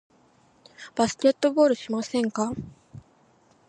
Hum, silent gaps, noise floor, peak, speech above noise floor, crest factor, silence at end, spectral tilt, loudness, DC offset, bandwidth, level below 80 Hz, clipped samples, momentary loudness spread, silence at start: none; none; -60 dBFS; -8 dBFS; 37 dB; 18 dB; 0.7 s; -4.5 dB/octave; -24 LUFS; under 0.1%; 10.5 kHz; -60 dBFS; under 0.1%; 16 LU; 0.8 s